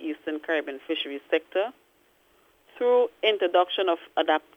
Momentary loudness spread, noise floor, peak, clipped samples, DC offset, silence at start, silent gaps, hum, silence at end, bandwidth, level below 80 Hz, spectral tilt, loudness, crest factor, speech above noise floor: 9 LU; -63 dBFS; -8 dBFS; under 0.1%; under 0.1%; 0 s; none; none; 0.15 s; 5.6 kHz; -78 dBFS; -3.5 dB/octave; -26 LUFS; 18 dB; 38 dB